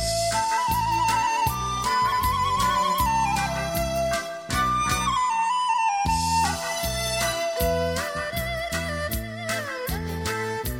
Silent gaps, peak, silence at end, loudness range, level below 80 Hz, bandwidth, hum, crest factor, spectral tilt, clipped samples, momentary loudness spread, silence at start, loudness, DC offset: none; -8 dBFS; 0 s; 4 LU; -38 dBFS; 17 kHz; none; 16 dB; -3.5 dB/octave; under 0.1%; 6 LU; 0 s; -24 LUFS; under 0.1%